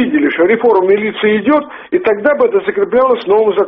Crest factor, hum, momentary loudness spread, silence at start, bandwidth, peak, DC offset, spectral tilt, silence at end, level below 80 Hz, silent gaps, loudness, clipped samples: 10 dB; none; 4 LU; 0 s; 5.2 kHz; 0 dBFS; under 0.1%; -3.5 dB/octave; 0 s; -52 dBFS; none; -12 LUFS; under 0.1%